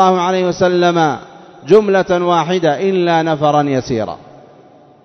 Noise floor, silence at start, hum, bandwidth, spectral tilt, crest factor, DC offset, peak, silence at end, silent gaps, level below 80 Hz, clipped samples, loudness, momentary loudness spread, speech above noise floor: -44 dBFS; 0 s; none; 6.4 kHz; -6 dB/octave; 14 dB; under 0.1%; 0 dBFS; 0.8 s; none; -52 dBFS; 0.1%; -14 LUFS; 9 LU; 31 dB